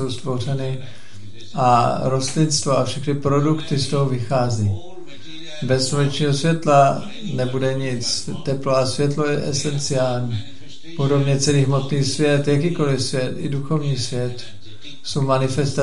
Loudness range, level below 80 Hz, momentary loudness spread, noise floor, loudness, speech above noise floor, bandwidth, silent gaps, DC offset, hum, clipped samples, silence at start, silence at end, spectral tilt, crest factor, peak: 2 LU; -50 dBFS; 15 LU; -40 dBFS; -20 LUFS; 21 dB; 11.5 kHz; none; 4%; none; under 0.1%; 0 s; 0 s; -5.5 dB/octave; 18 dB; -2 dBFS